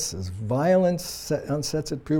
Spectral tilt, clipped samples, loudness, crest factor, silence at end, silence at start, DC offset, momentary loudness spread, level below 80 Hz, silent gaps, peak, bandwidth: -5.5 dB/octave; under 0.1%; -25 LUFS; 14 dB; 0 s; 0 s; under 0.1%; 9 LU; -50 dBFS; none; -10 dBFS; 18 kHz